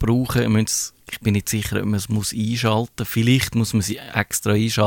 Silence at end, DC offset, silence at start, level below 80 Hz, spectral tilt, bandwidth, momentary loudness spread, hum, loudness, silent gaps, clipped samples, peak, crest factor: 0 s; under 0.1%; 0 s; -42 dBFS; -5 dB/octave; 17.5 kHz; 5 LU; none; -21 LUFS; none; under 0.1%; -2 dBFS; 18 dB